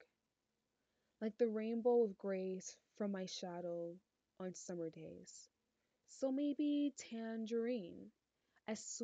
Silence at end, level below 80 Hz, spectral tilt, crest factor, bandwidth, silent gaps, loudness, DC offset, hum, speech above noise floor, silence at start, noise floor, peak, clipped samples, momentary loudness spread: 0 s; -90 dBFS; -5 dB/octave; 18 dB; 9 kHz; none; -42 LUFS; under 0.1%; none; 47 dB; 0 s; -89 dBFS; -26 dBFS; under 0.1%; 18 LU